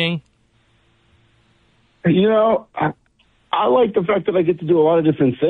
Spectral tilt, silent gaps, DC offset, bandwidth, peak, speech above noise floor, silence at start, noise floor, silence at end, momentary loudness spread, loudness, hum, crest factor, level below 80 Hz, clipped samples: -9.5 dB/octave; none; under 0.1%; 4.4 kHz; -6 dBFS; 43 dB; 0 s; -59 dBFS; 0 s; 9 LU; -17 LUFS; none; 12 dB; -56 dBFS; under 0.1%